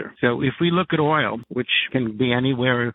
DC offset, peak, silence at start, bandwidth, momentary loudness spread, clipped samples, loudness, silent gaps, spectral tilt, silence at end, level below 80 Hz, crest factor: under 0.1%; -4 dBFS; 0 s; 4.1 kHz; 4 LU; under 0.1%; -21 LUFS; none; -9.5 dB/octave; 0 s; -56 dBFS; 18 dB